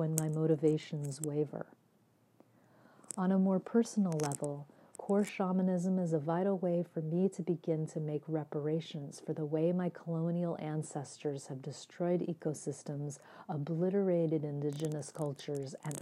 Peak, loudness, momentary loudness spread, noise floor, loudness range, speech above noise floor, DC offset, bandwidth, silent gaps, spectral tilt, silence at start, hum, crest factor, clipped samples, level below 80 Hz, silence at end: -10 dBFS; -35 LUFS; 11 LU; -70 dBFS; 4 LU; 35 dB; under 0.1%; 14.5 kHz; none; -7 dB/octave; 0 s; none; 26 dB; under 0.1%; -84 dBFS; 0 s